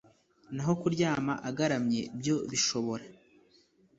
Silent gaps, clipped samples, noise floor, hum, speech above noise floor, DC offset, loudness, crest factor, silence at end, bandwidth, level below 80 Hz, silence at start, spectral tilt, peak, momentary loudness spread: none; under 0.1%; -65 dBFS; none; 34 dB; under 0.1%; -31 LUFS; 18 dB; 0.85 s; 8 kHz; -66 dBFS; 0.5 s; -4.5 dB/octave; -14 dBFS; 7 LU